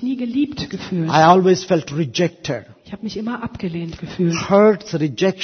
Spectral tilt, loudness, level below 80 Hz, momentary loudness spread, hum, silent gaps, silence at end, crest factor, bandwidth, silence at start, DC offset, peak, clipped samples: -6 dB/octave; -18 LUFS; -50 dBFS; 15 LU; none; none; 0 s; 18 dB; 6.6 kHz; 0 s; under 0.1%; 0 dBFS; under 0.1%